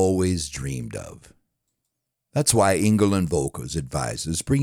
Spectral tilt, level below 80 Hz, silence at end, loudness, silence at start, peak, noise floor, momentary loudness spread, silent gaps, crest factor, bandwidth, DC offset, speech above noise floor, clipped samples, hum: -5 dB/octave; -46 dBFS; 0 s; -23 LUFS; 0 s; -4 dBFS; -80 dBFS; 13 LU; none; 20 dB; over 20 kHz; under 0.1%; 57 dB; under 0.1%; none